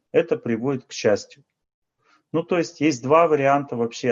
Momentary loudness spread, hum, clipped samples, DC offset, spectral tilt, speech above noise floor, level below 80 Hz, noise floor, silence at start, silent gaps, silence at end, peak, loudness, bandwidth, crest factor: 9 LU; none; under 0.1%; under 0.1%; -5.5 dB/octave; 43 dB; -68 dBFS; -64 dBFS; 0.15 s; 1.74-1.82 s; 0 s; -4 dBFS; -22 LUFS; 7.6 kHz; 18 dB